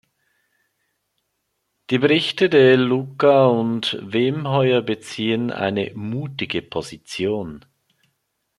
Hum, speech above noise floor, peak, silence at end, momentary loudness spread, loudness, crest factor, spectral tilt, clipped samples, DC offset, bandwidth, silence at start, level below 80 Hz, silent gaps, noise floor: none; 55 dB; -2 dBFS; 1 s; 13 LU; -19 LUFS; 18 dB; -6 dB/octave; under 0.1%; under 0.1%; 12 kHz; 1.9 s; -62 dBFS; none; -74 dBFS